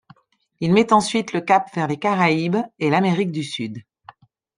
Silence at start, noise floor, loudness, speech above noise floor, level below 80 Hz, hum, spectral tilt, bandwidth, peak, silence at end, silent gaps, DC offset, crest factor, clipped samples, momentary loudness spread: 0.6 s; -53 dBFS; -20 LUFS; 34 dB; -62 dBFS; none; -5.5 dB/octave; 10.5 kHz; -2 dBFS; 0.75 s; none; under 0.1%; 18 dB; under 0.1%; 11 LU